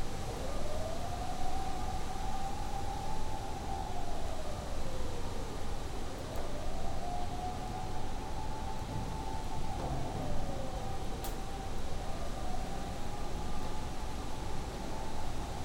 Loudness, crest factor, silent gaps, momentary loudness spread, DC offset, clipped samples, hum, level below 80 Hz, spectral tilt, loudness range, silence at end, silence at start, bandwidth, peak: -41 LUFS; 12 dB; none; 3 LU; under 0.1%; under 0.1%; none; -40 dBFS; -5 dB/octave; 2 LU; 0 s; 0 s; 13.5 kHz; -20 dBFS